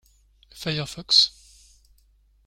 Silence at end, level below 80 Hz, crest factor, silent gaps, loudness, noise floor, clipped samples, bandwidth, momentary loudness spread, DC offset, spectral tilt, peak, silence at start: 1.15 s; -56 dBFS; 22 dB; none; -21 LUFS; -60 dBFS; under 0.1%; 16.5 kHz; 13 LU; under 0.1%; -2.5 dB/octave; -4 dBFS; 0.55 s